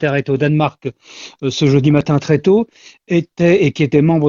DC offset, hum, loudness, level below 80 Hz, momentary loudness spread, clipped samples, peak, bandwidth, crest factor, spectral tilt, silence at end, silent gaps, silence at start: under 0.1%; none; -15 LUFS; -48 dBFS; 15 LU; under 0.1%; 0 dBFS; 7.4 kHz; 14 dB; -7 dB/octave; 0 s; none; 0 s